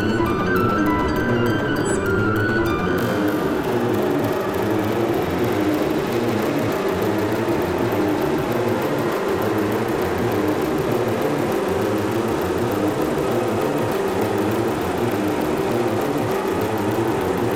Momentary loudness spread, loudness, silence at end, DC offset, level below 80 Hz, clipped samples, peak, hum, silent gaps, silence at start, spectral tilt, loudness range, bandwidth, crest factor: 2 LU; -21 LUFS; 0 s; under 0.1%; -44 dBFS; under 0.1%; -10 dBFS; none; none; 0 s; -6 dB/octave; 1 LU; 17 kHz; 10 dB